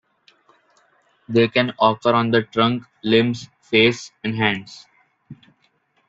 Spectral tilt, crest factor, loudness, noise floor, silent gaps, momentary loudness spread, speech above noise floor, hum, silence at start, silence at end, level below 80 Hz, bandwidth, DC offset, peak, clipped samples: -5.5 dB/octave; 20 dB; -19 LUFS; -64 dBFS; none; 11 LU; 45 dB; none; 1.3 s; 0.75 s; -60 dBFS; 7.8 kHz; under 0.1%; -2 dBFS; under 0.1%